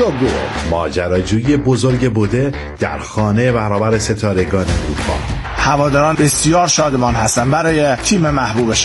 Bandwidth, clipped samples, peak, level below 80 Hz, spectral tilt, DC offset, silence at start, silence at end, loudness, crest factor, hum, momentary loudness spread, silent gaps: 11.5 kHz; under 0.1%; -2 dBFS; -30 dBFS; -5 dB/octave; under 0.1%; 0 s; 0 s; -15 LUFS; 14 dB; none; 7 LU; none